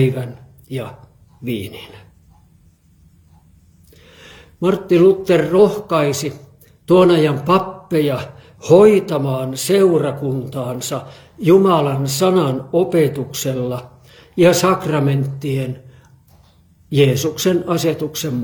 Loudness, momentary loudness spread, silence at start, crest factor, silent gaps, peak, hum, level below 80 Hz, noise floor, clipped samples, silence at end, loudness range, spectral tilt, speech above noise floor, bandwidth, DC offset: -16 LUFS; 16 LU; 0 s; 16 dB; none; 0 dBFS; none; -54 dBFS; -52 dBFS; under 0.1%; 0 s; 14 LU; -6 dB/octave; 36 dB; 19 kHz; under 0.1%